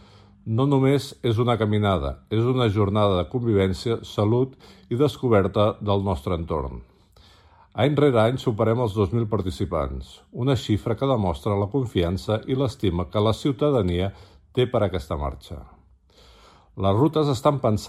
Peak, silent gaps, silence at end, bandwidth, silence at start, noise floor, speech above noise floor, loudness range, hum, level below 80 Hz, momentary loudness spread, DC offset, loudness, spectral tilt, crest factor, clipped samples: -6 dBFS; none; 0 s; 13 kHz; 0.45 s; -54 dBFS; 32 dB; 3 LU; none; -42 dBFS; 9 LU; under 0.1%; -23 LUFS; -7.5 dB/octave; 18 dB; under 0.1%